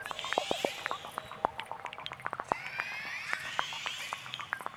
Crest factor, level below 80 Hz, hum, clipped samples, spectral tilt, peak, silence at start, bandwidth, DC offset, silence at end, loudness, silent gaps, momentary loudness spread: 30 dB; -70 dBFS; none; under 0.1%; -2 dB/octave; -8 dBFS; 0 s; over 20 kHz; under 0.1%; 0 s; -36 LUFS; none; 7 LU